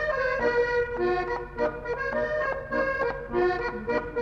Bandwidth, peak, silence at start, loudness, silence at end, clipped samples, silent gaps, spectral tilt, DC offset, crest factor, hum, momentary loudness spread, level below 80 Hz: 7.2 kHz; -12 dBFS; 0 s; -27 LUFS; 0 s; under 0.1%; none; -6.5 dB/octave; under 0.1%; 14 dB; none; 5 LU; -46 dBFS